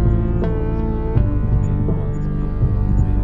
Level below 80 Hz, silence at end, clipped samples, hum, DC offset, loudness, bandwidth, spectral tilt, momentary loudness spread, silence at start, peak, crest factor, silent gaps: -20 dBFS; 0 s; under 0.1%; none; under 0.1%; -20 LUFS; 7.2 kHz; -11 dB/octave; 4 LU; 0 s; -4 dBFS; 14 dB; none